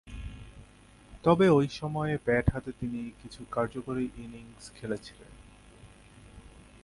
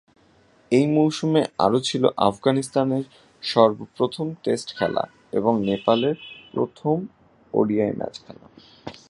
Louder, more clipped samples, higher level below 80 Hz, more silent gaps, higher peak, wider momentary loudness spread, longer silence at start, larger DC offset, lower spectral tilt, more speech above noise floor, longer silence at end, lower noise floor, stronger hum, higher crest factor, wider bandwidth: second, -29 LUFS vs -23 LUFS; neither; first, -48 dBFS vs -60 dBFS; neither; second, -10 dBFS vs -2 dBFS; first, 23 LU vs 13 LU; second, 0.05 s vs 0.7 s; neither; about the same, -7 dB/octave vs -6 dB/octave; second, 26 dB vs 35 dB; first, 0.4 s vs 0.15 s; about the same, -55 dBFS vs -57 dBFS; neither; about the same, 22 dB vs 22 dB; about the same, 11.5 kHz vs 11.5 kHz